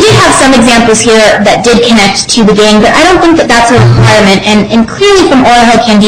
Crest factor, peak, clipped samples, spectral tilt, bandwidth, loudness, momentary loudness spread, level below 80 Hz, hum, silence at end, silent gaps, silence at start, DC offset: 4 dB; 0 dBFS; 2%; -4.5 dB/octave; 16 kHz; -4 LUFS; 3 LU; -26 dBFS; none; 0 s; none; 0 s; under 0.1%